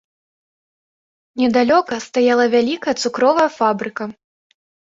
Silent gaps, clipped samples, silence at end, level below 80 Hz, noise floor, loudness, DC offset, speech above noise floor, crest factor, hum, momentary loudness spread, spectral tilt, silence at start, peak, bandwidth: none; under 0.1%; 0.85 s; -62 dBFS; under -90 dBFS; -17 LUFS; under 0.1%; over 74 dB; 16 dB; none; 12 LU; -4 dB/octave; 1.35 s; -2 dBFS; 7.8 kHz